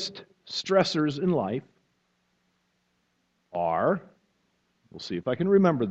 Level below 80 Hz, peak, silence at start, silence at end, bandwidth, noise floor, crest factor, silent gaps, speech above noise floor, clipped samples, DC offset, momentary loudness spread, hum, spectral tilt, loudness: -68 dBFS; -6 dBFS; 0 s; 0 s; 8.2 kHz; -73 dBFS; 22 dB; none; 48 dB; under 0.1%; under 0.1%; 14 LU; 60 Hz at -60 dBFS; -6 dB/octave; -26 LUFS